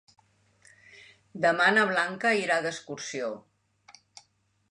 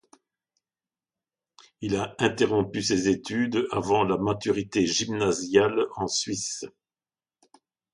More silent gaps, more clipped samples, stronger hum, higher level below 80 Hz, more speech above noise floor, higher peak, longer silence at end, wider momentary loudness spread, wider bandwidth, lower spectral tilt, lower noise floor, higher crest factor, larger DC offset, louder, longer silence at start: neither; neither; neither; second, -78 dBFS vs -58 dBFS; second, 43 dB vs over 65 dB; second, -10 dBFS vs -6 dBFS; about the same, 1.3 s vs 1.25 s; first, 15 LU vs 8 LU; about the same, 11 kHz vs 11.5 kHz; about the same, -3.5 dB/octave vs -4 dB/octave; second, -69 dBFS vs under -90 dBFS; about the same, 20 dB vs 22 dB; neither; about the same, -26 LUFS vs -25 LUFS; second, 1.35 s vs 1.8 s